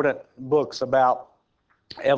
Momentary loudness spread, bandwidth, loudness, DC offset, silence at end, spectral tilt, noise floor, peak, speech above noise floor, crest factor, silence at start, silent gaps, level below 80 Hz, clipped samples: 13 LU; 8 kHz; -24 LUFS; under 0.1%; 0 s; -5.5 dB/octave; -68 dBFS; -8 dBFS; 46 dB; 16 dB; 0 s; none; -64 dBFS; under 0.1%